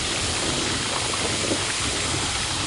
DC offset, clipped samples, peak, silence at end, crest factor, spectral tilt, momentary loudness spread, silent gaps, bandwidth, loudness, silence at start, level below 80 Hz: under 0.1%; under 0.1%; -10 dBFS; 0 s; 14 dB; -2 dB/octave; 1 LU; none; 11.5 kHz; -23 LUFS; 0 s; -40 dBFS